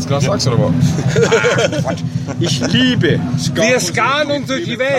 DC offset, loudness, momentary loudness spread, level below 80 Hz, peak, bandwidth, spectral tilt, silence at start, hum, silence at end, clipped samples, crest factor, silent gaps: under 0.1%; -14 LUFS; 7 LU; -42 dBFS; 0 dBFS; 15 kHz; -5 dB/octave; 0 s; none; 0 s; under 0.1%; 14 dB; none